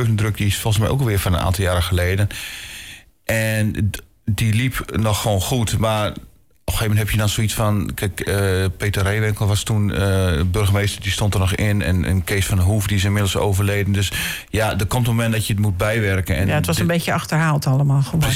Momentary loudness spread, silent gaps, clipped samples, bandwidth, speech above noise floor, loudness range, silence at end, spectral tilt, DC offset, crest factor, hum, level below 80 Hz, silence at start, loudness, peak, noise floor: 5 LU; none; under 0.1%; 16.5 kHz; 21 dB; 2 LU; 0 s; -5 dB/octave; under 0.1%; 10 dB; none; -34 dBFS; 0 s; -19 LUFS; -10 dBFS; -40 dBFS